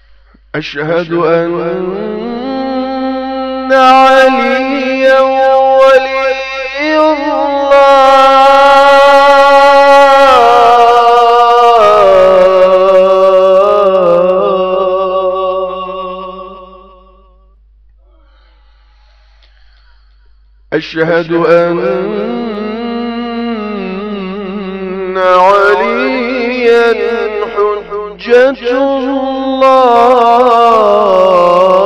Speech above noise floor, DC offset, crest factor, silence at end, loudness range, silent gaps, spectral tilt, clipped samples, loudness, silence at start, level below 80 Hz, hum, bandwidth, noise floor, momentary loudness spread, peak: 35 dB; under 0.1%; 8 dB; 0 s; 12 LU; none; -5 dB/octave; 1%; -8 LUFS; 0.55 s; -42 dBFS; none; 11 kHz; -44 dBFS; 14 LU; 0 dBFS